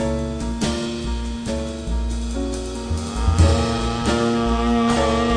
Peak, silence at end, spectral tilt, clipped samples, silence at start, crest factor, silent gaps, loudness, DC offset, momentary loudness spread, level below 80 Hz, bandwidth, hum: -4 dBFS; 0 s; -5.5 dB/octave; under 0.1%; 0 s; 16 dB; none; -22 LUFS; under 0.1%; 9 LU; -26 dBFS; 10 kHz; none